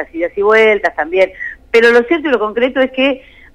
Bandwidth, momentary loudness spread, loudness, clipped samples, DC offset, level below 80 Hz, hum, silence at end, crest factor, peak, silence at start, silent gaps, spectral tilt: 10.5 kHz; 7 LU; -12 LUFS; under 0.1%; under 0.1%; -46 dBFS; none; 0.35 s; 12 dB; -2 dBFS; 0 s; none; -4.5 dB/octave